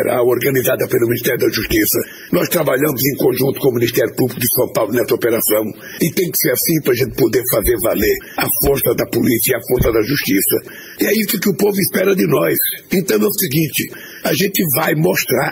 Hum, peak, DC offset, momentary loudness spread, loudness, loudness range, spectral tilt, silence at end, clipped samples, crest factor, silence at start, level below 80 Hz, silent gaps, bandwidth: none; -4 dBFS; under 0.1%; 4 LU; -15 LUFS; 1 LU; -4.5 dB/octave; 0 s; under 0.1%; 12 dB; 0 s; -38 dBFS; none; 16.5 kHz